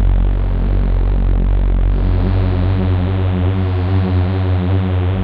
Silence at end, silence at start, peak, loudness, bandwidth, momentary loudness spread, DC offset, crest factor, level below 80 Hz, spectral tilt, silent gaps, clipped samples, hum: 0 s; 0 s; -4 dBFS; -17 LUFS; 4.6 kHz; 2 LU; under 0.1%; 10 dB; -16 dBFS; -10.5 dB/octave; none; under 0.1%; none